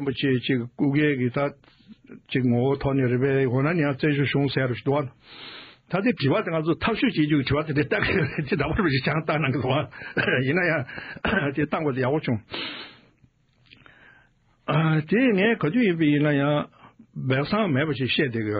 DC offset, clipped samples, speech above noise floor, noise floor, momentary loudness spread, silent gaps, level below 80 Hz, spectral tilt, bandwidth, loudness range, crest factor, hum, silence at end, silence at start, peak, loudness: under 0.1%; under 0.1%; 38 dB; -61 dBFS; 9 LU; none; -50 dBFS; -5 dB/octave; 5.2 kHz; 5 LU; 16 dB; none; 0 s; 0 s; -8 dBFS; -24 LUFS